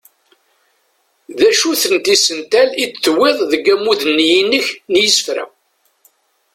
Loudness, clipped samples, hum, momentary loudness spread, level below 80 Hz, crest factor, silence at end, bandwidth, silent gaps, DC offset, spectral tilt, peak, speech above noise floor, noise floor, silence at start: -13 LUFS; under 0.1%; none; 5 LU; -60 dBFS; 16 dB; 1.1 s; 16.5 kHz; none; under 0.1%; -1 dB/octave; 0 dBFS; 48 dB; -61 dBFS; 1.3 s